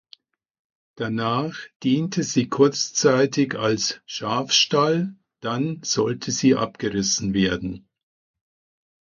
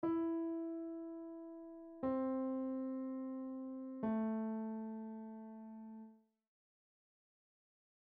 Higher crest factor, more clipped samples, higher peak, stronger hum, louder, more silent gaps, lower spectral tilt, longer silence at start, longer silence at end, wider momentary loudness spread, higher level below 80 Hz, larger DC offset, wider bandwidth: about the same, 20 dB vs 16 dB; neither; first, -4 dBFS vs -28 dBFS; neither; first, -22 LUFS vs -43 LUFS; first, 1.76-1.80 s vs none; second, -4 dB/octave vs -8.5 dB/octave; first, 1 s vs 0 s; second, 1.25 s vs 1.95 s; second, 11 LU vs 14 LU; first, -54 dBFS vs -78 dBFS; neither; first, 7.4 kHz vs 3.6 kHz